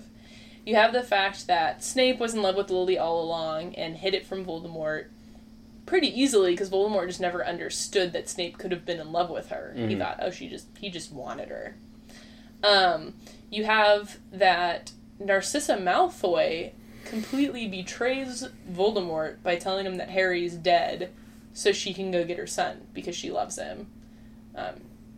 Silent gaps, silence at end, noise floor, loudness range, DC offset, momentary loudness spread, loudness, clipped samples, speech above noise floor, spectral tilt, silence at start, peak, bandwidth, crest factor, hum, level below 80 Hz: none; 0 s; -49 dBFS; 7 LU; under 0.1%; 15 LU; -27 LUFS; under 0.1%; 22 dB; -3.5 dB/octave; 0 s; -8 dBFS; 15.5 kHz; 20 dB; none; -56 dBFS